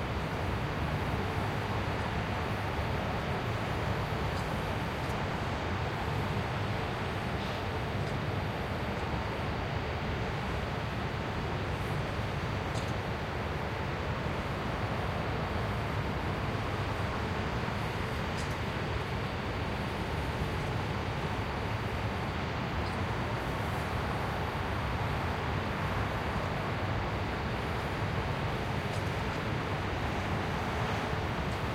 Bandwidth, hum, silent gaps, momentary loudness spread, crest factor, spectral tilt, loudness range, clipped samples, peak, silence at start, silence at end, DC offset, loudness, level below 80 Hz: 16.5 kHz; none; none; 1 LU; 14 dB; -6 dB/octave; 1 LU; under 0.1%; -20 dBFS; 0 s; 0 s; under 0.1%; -34 LUFS; -44 dBFS